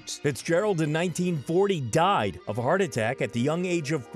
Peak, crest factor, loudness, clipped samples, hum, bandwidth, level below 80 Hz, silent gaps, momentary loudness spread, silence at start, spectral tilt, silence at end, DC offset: -12 dBFS; 14 dB; -26 LUFS; under 0.1%; none; 15 kHz; -60 dBFS; none; 5 LU; 0.05 s; -5.5 dB/octave; 0 s; under 0.1%